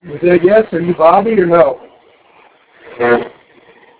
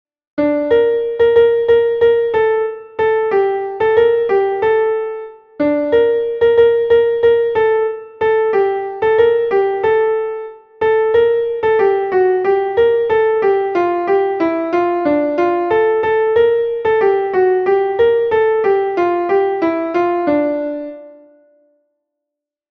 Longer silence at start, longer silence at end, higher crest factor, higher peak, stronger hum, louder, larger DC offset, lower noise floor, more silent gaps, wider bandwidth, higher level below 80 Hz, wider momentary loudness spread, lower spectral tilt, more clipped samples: second, 0.05 s vs 0.35 s; second, 0.7 s vs 1.6 s; about the same, 14 dB vs 12 dB; about the same, 0 dBFS vs -2 dBFS; neither; first, -11 LUFS vs -15 LUFS; neither; second, -47 dBFS vs -82 dBFS; neither; second, 4 kHz vs 4.8 kHz; about the same, -50 dBFS vs -50 dBFS; about the same, 8 LU vs 7 LU; first, -11 dB/octave vs -7 dB/octave; neither